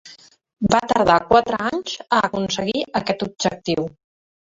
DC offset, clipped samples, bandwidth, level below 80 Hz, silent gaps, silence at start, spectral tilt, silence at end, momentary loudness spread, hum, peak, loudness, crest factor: under 0.1%; under 0.1%; 8 kHz; -48 dBFS; none; 0.05 s; -4.5 dB/octave; 0.6 s; 9 LU; none; -2 dBFS; -20 LUFS; 20 dB